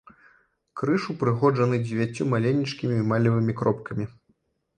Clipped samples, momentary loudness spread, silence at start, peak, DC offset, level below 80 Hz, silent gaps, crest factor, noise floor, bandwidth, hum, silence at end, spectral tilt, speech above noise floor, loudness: under 0.1%; 10 LU; 0.75 s; -8 dBFS; under 0.1%; -60 dBFS; none; 16 dB; -69 dBFS; 9.4 kHz; none; 0.65 s; -8 dB/octave; 45 dB; -25 LUFS